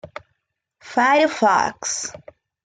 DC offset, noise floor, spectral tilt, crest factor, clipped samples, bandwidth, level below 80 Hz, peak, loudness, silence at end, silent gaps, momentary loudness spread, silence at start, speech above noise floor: under 0.1%; -74 dBFS; -2 dB/octave; 16 dB; under 0.1%; 9.6 kHz; -64 dBFS; -6 dBFS; -19 LUFS; 0.5 s; none; 18 LU; 0.05 s; 55 dB